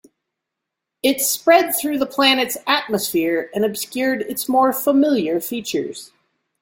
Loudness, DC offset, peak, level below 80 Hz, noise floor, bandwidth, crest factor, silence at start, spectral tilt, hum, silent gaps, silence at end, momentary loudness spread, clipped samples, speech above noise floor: -18 LUFS; under 0.1%; -2 dBFS; -64 dBFS; -82 dBFS; 17 kHz; 18 dB; 1.05 s; -2.5 dB/octave; none; none; 0.55 s; 9 LU; under 0.1%; 63 dB